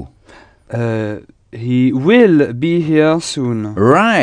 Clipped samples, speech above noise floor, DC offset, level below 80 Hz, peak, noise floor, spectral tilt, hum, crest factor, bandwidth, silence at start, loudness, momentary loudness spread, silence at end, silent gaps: under 0.1%; 31 dB; under 0.1%; -50 dBFS; 0 dBFS; -44 dBFS; -6.5 dB/octave; none; 14 dB; 10 kHz; 0 s; -14 LUFS; 14 LU; 0 s; none